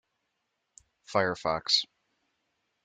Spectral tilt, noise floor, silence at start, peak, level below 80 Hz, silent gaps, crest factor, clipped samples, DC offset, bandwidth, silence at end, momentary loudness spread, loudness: -2.5 dB/octave; -81 dBFS; 1.1 s; -10 dBFS; -66 dBFS; none; 24 dB; under 0.1%; under 0.1%; 12 kHz; 1 s; 6 LU; -28 LUFS